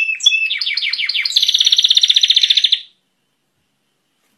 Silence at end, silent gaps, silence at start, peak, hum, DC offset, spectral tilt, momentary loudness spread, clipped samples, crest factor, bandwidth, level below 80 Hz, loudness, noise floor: 1.55 s; none; 0 s; 0 dBFS; none; under 0.1%; 5.5 dB/octave; 7 LU; under 0.1%; 16 dB; 14.5 kHz; -70 dBFS; -11 LUFS; -67 dBFS